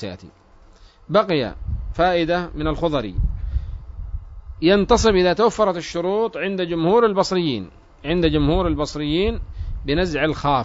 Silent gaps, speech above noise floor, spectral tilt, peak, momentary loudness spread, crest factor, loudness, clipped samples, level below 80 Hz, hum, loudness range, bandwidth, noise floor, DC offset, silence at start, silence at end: none; 29 dB; -6 dB/octave; -4 dBFS; 17 LU; 18 dB; -20 LUFS; under 0.1%; -30 dBFS; none; 4 LU; 7.8 kHz; -48 dBFS; under 0.1%; 0 s; 0 s